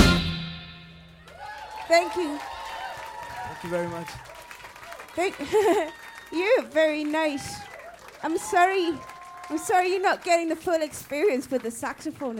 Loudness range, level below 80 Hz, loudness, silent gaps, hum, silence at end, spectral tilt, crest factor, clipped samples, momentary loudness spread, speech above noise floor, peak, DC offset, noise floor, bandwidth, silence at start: 5 LU; -44 dBFS; -26 LUFS; none; none; 0 s; -4.5 dB/octave; 26 dB; under 0.1%; 20 LU; 23 dB; 0 dBFS; under 0.1%; -48 dBFS; 17 kHz; 0 s